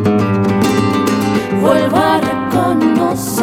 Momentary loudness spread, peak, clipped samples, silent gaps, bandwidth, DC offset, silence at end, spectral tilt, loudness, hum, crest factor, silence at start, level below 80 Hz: 3 LU; 0 dBFS; under 0.1%; none; 17.5 kHz; under 0.1%; 0 s; -6 dB/octave; -13 LUFS; none; 12 dB; 0 s; -48 dBFS